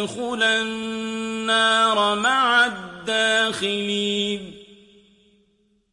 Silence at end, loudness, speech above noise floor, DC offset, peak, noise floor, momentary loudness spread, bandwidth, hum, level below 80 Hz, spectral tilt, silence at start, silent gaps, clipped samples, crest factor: 1.3 s; -20 LUFS; 43 dB; under 0.1%; -6 dBFS; -64 dBFS; 11 LU; 11.5 kHz; none; -62 dBFS; -2.5 dB/octave; 0 s; none; under 0.1%; 18 dB